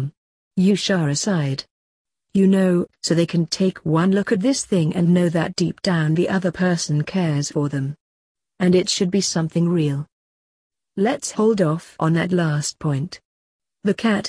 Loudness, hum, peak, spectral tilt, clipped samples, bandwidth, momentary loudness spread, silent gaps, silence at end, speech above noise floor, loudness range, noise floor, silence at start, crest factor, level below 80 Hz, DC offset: -20 LUFS; none; -6 dBFS; -5.5 dB/octave; under 0.1%; 11 kHz; 9 LU; 0.17-0.51 s, 1.70-2.05 s, 8.00-8.35 s, 10.12-10.70 s, 13.25-13.59 s; 0 s; over 71 dB; 3 LU; under -90 dBFS; 0 s; 14 dB; -58 dBFS; under 0.1%